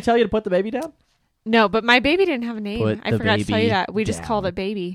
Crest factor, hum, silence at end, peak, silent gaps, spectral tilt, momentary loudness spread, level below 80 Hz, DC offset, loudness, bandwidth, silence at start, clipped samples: 20 dB; none; 0 s; -2 dBFS; none; -5.5 dB/octave; 11 LU; -46 dBFS; under 0.1%; -20 LUFS; 13 kHz; 0 s; under 0.1%